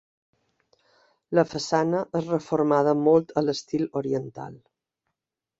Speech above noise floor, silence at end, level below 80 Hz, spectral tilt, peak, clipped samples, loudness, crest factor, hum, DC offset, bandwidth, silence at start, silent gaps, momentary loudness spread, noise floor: 61 dB; 1.05 s; -66 dBFS; -6.5 dB/octave; -6 dBFS; under 0.1%; -24 LUFS; 20 dB; none; under 0.1%; 8 kHz; 1.3 s; none; 9 LU; -85 dBFS